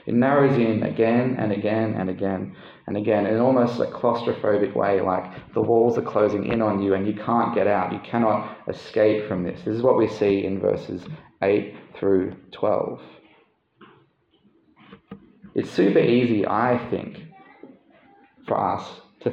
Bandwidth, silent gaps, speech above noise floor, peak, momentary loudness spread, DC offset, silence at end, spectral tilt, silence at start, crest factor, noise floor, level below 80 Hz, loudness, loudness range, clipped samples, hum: 7.6 kHz; none; 40 dB; -6 dBFS; 12 LU; under 0.1%; 0 s; -8.5 dB/octave; 0.05 s; 16 dB; -62 dBFS; -62 dBFS; -22 LUFS; 5 LU; under 0.1%; none